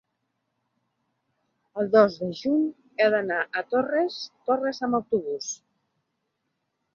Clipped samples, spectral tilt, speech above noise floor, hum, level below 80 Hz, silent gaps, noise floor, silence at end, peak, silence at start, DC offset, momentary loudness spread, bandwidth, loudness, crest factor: under 0.1%; -4.5 dB/octave; 54 dB; none; -72 dBFS; none; -78 dBFS; 1.4 s; -6 dBFS; 1.75 s; under 0.1%; 12 LU; 7.4 kHz; -25 LUFS; 22 dB